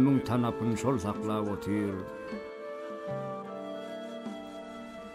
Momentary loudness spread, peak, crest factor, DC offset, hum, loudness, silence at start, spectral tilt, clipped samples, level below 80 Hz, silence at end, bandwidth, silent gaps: 12 LU; -14 dBFS; 18 dB; under 0.1%; none; -34 LUFS; 0 s; -7 dB/octave; under 0.1%; -62 dBFS; 0 s; 14.5 kHz; none